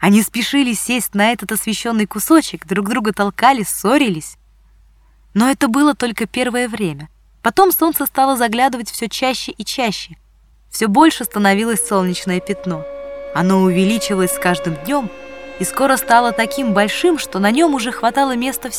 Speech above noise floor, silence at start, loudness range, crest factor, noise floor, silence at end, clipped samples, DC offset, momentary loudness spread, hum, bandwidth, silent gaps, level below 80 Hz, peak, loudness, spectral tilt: 34 dB; 0 s; 2 LU; 16 dB; -50 dBFS; 0 s; under 0.1%; under 0.1%; 10 LU; none; 18 kHz; none; -48 dBFS; 0 dBFS; -16 LUFS; -4 dB/octave